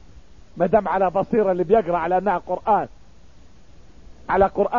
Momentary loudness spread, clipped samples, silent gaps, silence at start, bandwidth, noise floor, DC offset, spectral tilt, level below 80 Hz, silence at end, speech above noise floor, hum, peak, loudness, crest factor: 5 LU; under 0.1%; none; 0.55 s; 7.2 kHz; -50 dBFS; 0.6%; -8.5 dB/octave; -46 dBFS; 0 s; 30 dB; none; -4 dBFS; -20 LUFS; 18 dB